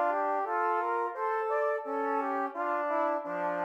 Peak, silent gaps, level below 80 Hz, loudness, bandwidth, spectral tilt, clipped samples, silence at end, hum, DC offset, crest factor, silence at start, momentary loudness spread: -18 dBFS; none; -90 dBFS; -31 LUFS; 8.4 kHz; -6 dB/octave; under 0.1%; 0 s; none; under 0.1%; 12 dB; 0 s; 3 LU